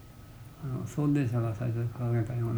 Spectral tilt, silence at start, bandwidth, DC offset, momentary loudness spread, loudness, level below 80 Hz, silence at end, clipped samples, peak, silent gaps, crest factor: -8.5 dB/octave; 0 s; over 20 kHz; under 0.1%; 20 LU; -31 LUFS; -54 dBFS; 0 s; under 0.1%; -18 dBFS; none; 12 dB